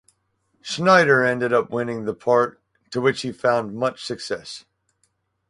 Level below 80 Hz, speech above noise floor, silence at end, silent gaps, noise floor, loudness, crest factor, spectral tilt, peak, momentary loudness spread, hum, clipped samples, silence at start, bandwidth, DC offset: -64 dBFS; 49 dB; 0.9 s; none; -70 dBFS; -21 LUFS; 20 dB; -5 dB/octave; -2 dBFS; 15 LU; none; under 0.1%; 0.65 s; 11.5 kHz; under 0.1%